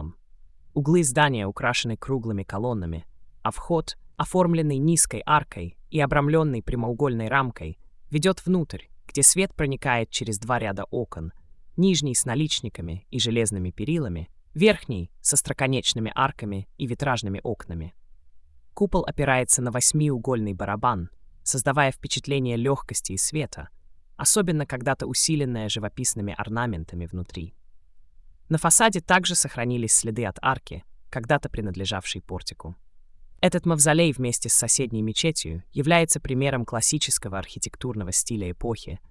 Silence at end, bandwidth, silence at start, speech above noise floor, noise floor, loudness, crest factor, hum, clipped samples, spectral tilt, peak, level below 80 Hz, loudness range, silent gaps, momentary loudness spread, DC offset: 0.1 s; 12 kHz; 0 s; 25 dB; -49 dBFS; -23 LUFS; 24 dB; none; under 0.1%; -3.5 dB/octave; 0 dBFS; -46 dBFS; 5 LU; none; 15 LU; under 0.1%